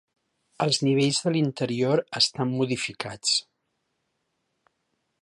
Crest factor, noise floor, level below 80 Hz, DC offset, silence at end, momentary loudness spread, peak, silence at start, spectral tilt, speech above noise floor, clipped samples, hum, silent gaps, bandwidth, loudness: 18 dB; -77 dBFS; -68 dBFS; under 0.1%; 1.8 s; 6 LU; -8 dBFS; 0.6 s; -4 dB/octave; 52 dB; under 0.1%; none; none; 11.5 kHz; -24 LUFS